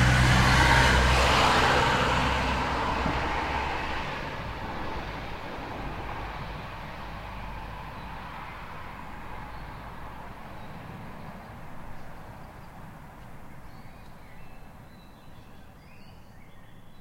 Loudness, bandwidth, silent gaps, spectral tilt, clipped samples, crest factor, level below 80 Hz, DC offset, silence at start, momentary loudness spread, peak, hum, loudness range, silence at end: -25 LUFS; 16 kHz; none; -4.5 dB/octave; under 0.1%; 22 dB; -36 dBFS; under 0.1%; 0 s; 26 LU; -8 dBFS; none; 25 LU; 0 s